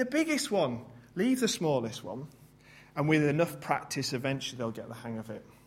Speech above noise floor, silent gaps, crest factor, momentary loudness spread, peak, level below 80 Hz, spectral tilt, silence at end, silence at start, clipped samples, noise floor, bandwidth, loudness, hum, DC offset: 26 dB; none; 22 dB; 15 LU; -10 dBFS; -68 dBFS; -5 dB/octave; 0.15 s; 0 s; under 0.1%; -56 dBFS; 16 kHz; -31 LUFS; none; under 0.1%